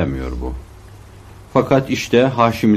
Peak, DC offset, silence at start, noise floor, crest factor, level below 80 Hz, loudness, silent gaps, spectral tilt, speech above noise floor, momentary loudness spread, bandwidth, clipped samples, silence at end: -2 dBFS; under 0.1%; 0 s; -40 dBFS; 16 dB; -34 dBFS; -17 LUFS; none; -6.5 dB/octave; 24 dB; 13 LU; 14.5 kHz; under 0.1%; 0 s